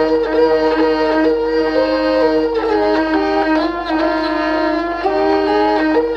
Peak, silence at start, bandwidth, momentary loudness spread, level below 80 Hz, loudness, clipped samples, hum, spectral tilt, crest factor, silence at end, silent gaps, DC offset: -2 dBFS; 0 s; 7 kHz; 3 LU; -40 dBFS; -15 LUFS; under 0.1%; none; -5.5 dB/octave; 12 dB; 0 s; none; under 0.1%